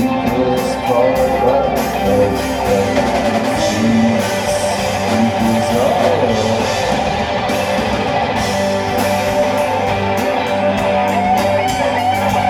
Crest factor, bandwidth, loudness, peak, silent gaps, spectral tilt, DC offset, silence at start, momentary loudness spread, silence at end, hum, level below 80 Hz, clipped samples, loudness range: 14 dB; 19.5 kHz; -15 LUFS; -2 dBFS; none; -5 dB/octave; under 0.1%; 0 s; 3 LU; 0 s; none; -36 dBFS; under 0.1%; 1 LU